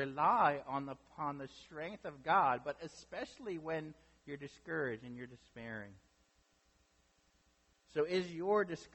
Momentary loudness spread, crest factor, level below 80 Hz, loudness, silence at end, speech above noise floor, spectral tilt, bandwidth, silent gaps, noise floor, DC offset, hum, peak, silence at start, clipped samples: 18 LU; 20 dB; -72 dBFS; -38 LUFS; 0.1 s; 36 dB; -6 dB/octave; 8.4 kHz; none; -74 dBFS; under 0.1%; none; -18 dBFS; 0 s; under 0.1%